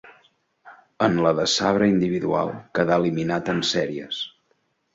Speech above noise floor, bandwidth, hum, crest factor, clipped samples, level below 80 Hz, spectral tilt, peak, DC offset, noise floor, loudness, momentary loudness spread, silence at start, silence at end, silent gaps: 47 dB; 8 kHz; none; 20 dB; under 0.1%; -56 dBFS; -5 dB/octave; -4 dBFS; under 0.1%; -69 dBFS; -22 LUFS; 9 LU; 0.05 s; 0.65 s; none